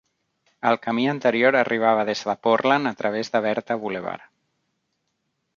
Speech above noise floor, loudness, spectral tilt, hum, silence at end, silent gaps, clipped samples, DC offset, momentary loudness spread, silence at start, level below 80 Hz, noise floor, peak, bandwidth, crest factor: 54 dB; -22 LUFS; -5.5 dB/octave; none; 1.4 s; none; under 0.1%; under 0.1%; 9 LU; 0.65 s; -70 dBFS; -75 dBFS; -4 dBFS; 7.4 kHz; 20 dB